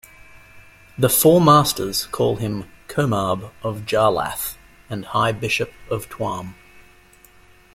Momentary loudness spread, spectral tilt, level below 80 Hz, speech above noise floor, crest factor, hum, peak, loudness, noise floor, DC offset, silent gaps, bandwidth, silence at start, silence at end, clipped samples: 16 LU; -4.5 dB/octave; -50 dBFS; 31 dB; 20 dB; none; -2 dBFS; -20 LUFS; -50 dBFS; under 0.1%; none; 16.5 kHz; 0.55 s; 1.25 s; under 0.1%